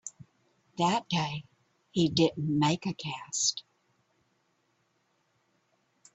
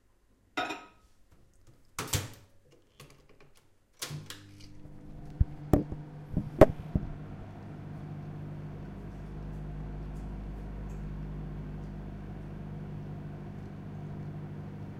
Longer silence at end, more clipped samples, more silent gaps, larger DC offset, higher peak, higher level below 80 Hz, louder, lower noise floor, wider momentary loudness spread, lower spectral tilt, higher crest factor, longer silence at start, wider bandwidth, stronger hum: first, 2.55 s vs 0 s; neither; neither; neither; second, -10 dBFS vs 0 dBFS; second, -68 dBFS vs -44 dBFS; first, -29 LUFS vs -36 LUFS; first, -74 dBFS vs -66 dBFS; about the same, 15 LU vs 17 LU; second, -4 dB/octave vs -6 dB/octave; second, 22 dB vs 34 dB; second, 0.05 s vs 0.55 s; second, 8.4 kHz vs 16 kHz; neither